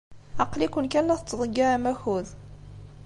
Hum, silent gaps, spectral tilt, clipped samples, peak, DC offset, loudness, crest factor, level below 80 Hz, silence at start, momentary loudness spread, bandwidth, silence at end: 50 Hz at -50 dBFS; none; -5.5 dB/octave; under 0.1%; -8 dBFS; under 0.1%; -26 LUFS; 18 dB; -48 dBFS; 0.1 s; 22 LU; 11.5 kHz; 0 s